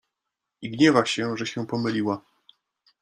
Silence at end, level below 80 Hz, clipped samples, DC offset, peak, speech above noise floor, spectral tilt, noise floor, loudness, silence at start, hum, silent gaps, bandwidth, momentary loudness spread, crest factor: 0.85 s; -66 dBFS; under 0.1%; under 0.1%; -4 dBFS; 61 dB; -5 dB/octave; -84 dBFS; -24 LUFS; 0.6 s; none; none; 10.5 kHz; 15 LU; 22 dB